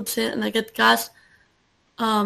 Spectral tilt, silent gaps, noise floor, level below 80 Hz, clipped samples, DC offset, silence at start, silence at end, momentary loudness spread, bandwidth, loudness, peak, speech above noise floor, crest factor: -3 dB/octave; none; -64 dBFS; -62 dBFS; under 0.1%; under 0.1%; 0 s; 0 s; 9 LU; 14 kHz; -21 LUFS; -4 dBFS; 43 dB; 18 dB